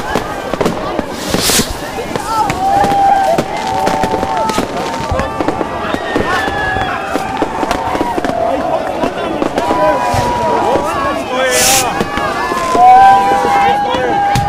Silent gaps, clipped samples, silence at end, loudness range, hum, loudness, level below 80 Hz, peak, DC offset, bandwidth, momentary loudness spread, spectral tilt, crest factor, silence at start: none; 0.2%; 0 s; 6 LU; none; -13 LUFS; -34 dBFS; 0 dBFS; 1%; 16 kHz; 9 LU; -3.5 dB/octave; 12 dB; 0 s